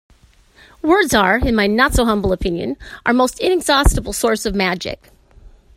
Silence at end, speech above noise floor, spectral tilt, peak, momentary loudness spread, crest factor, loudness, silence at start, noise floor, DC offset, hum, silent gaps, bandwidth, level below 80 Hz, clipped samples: 0.3 s; 34 dB; -4.5 dB/octave; 0 dBFS; 10 LU; 18 dB; -16 LUFS; 0.85 s; -50 dBFS; under 0.1%; none; none; 16 kHz; -26 dBFS; under 0.1%